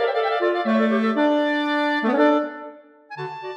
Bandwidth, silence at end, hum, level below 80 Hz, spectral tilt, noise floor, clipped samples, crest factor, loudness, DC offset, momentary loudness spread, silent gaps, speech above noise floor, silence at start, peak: 8.4 kHz; 0 s; none; -82 dBFS; -6.5 dB/octave; -41 dBFS; under 0.1%; 14 dB; -20 LUFS; under 0.1%; 15 LU; none; 23 dB; 0 s; -8 dBFS